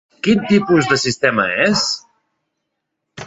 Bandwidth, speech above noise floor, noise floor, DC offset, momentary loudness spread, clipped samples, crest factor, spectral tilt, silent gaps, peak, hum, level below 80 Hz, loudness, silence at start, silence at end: 8 kHz; 60 dB; -76 dBFS; under 0.1%; 4 LU; under 0.1%; 16 dB; -4 dB/octave; none; -2 dBFS; none; -52 dBFS; -15 LUFS; 0.25 s; 0 s